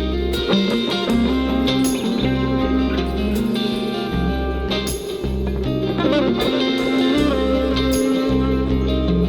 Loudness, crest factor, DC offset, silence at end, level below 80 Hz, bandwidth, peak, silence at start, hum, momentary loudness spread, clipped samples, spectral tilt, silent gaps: -19 LUFS; 14 dB; under 0.1%; 0 s; -28 dBFS; over 20 kHz; -4 dBFS; 0 s; none; 4 LU; under 0.1%; -6 dB/octave; none